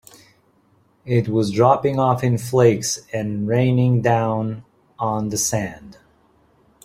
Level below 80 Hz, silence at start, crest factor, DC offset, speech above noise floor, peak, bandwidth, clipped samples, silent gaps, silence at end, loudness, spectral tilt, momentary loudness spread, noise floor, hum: -54 dBFS; 1.05 s; 18 dB; under 0.1%; 40 dB; -2 dBFS; 16 kHz; under 0.1%; none; 0.95 s; -19 LUFS; -6 dB/octave; 10 LU; -59 dBFS; none